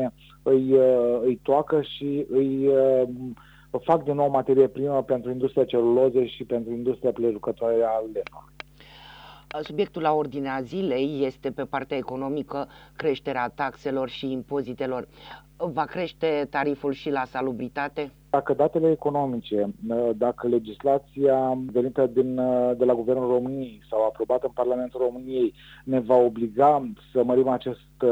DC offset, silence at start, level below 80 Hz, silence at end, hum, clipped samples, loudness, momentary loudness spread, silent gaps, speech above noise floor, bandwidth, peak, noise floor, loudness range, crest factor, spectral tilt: under 0.1%; 0 s; -58 dBFS; 0 s; none; under 0.1%; -25 LUFS; 12 LU; none; 24 dB; 7.8 kHz; -6 dBFS; -49 dBFS; 6 LU; 18 dB; -8 dB/octave